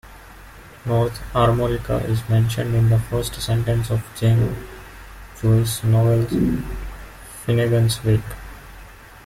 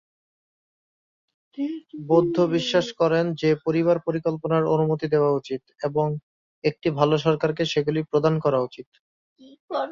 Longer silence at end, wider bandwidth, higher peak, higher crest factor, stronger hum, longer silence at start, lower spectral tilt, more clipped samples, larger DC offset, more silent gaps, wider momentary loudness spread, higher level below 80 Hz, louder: about the same, 0.05 s vs 0 s; first, 15.5 kHz vs 7.4 kHz; about the same, -6 dBFS vs -4 dBFS; about the same, 16 dB vs 20 dB; neither; second, 0.05 s vs 1.55 s; about the same, -6.5 dB/octave vs -7 dB/octave; neither; neither; second, none vs 6.23-6.62 s, 8.86-8.92 s, 9.00-9.36 s, 9.60-9.68 s; first, 20 LU vs 10 LU; first, -36 dBFS vs -62 dBFS; first, -20 LUFS vs -23 LUFS